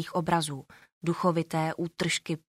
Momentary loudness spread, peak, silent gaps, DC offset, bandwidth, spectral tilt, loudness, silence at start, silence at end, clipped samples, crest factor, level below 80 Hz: 8 LU; -12 dBFS; 0.92-1.01 s; under 0.1%; 15 kHz; -5 dB/octave; -29 LUFS; 0 s; 0.2 s; under 0.1%; 18 dB; -64 dBFS